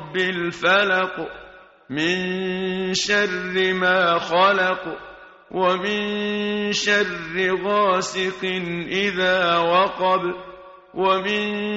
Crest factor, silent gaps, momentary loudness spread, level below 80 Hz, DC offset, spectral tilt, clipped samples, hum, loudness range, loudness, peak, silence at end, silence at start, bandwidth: 18 dB; none; 11 LU; -58 dBFS; under 0.1%; -2 dB/octave; under 0.1%; none; 2 LU; -20 LUFS; -4 dBFS; 0 s; 0 s; 8 kHz